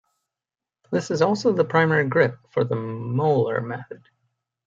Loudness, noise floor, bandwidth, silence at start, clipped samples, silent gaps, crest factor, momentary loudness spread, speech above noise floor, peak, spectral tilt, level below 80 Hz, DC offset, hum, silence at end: -22 LUFS; -89 dBFS; 7.8 kHz; 0.9 s; under 0.1%; none; 20 dB; 9 LU; 68 dB; -4 dBFS; -7 dB/octave; -66 dBFS; under 0.1%; none; 0.7 s